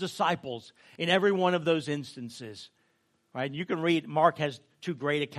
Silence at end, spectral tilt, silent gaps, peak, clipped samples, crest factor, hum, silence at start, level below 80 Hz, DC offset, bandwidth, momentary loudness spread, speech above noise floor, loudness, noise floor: 0 s; -5.5 dB/octave; none; -8 dBFS; under 0.1%; 22 dB; none; 0 s; -76 dBFS; under 0.1%; 13.5 kHz; 17 LU; 43 dB; -28 LUFS; -72 dBFS